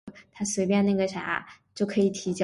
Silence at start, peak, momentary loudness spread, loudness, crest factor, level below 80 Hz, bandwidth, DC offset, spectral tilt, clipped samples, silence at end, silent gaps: 0.05 s; -12 dBFS; 10 LU; -27 LUFS; 16 dB; -64 dBFS; 11.5 kHz; under 0.1%; -5 dB/octave; under 0.1%; 0 s; none